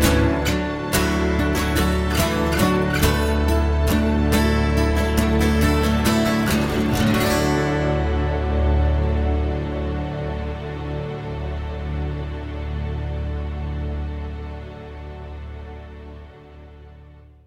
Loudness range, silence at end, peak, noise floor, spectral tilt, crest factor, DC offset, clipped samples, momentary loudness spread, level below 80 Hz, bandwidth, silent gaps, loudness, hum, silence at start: 12 LU; 0.25 s; -4 dBFS; -45 dBFS; -5.5 dB/octave; 16 dB; under 0.1%; under 0.1%; 16 LU; -26 dBFS; 16.5 kHz; none; -21 LUFS; none; 0 s